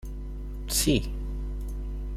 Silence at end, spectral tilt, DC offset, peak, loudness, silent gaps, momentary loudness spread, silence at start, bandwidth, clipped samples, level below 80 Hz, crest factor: 0 s; -4 dB/octave; under 0.1%; -12 dBFS; -30 LUFS; none; 15 LU; 0 s; 16 kHz; under 0.1%; -32 dBFS; 18 dB